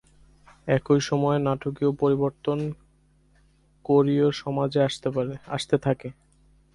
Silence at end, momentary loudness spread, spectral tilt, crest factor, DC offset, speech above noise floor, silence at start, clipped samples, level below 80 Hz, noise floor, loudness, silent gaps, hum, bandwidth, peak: 0.6 s; 10 LU; -6.5 dB/octave; 18 dB; under 0.1%; 37 dB; 0.65 s; under 0.1%; -56 dBFS; -61 dBFS; -25 LUFS; none; none; 11.5 kHz; -8 dBFS